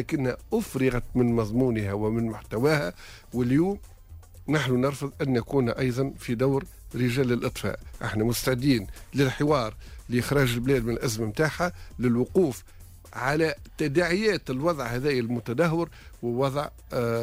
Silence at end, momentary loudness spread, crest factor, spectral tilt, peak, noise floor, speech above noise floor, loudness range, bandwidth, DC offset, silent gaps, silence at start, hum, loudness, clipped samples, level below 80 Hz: 0 s; 9 LU; 14 dB; -6 dB/octave; -12 dBFS; -46 dBFS; 20 dB; 1 LU; 16 kHz; under 0.1%; none; 0 s; none; -26 LUFS; under 0.1%; -46 dBFS